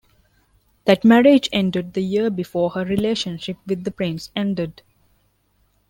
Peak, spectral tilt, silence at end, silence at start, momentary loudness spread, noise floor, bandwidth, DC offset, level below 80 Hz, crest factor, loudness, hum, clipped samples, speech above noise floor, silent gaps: -2 dBFS; -6 dB/octave; 1.2 s; 0.85 s; 13 LU; -63 dBFS; 16.5 kHz; under 0.1%; -54 dBFS; 18 dB; -20 LUFS; 50 Hz at -45 dBFS; under 0.1%; 45 dB; none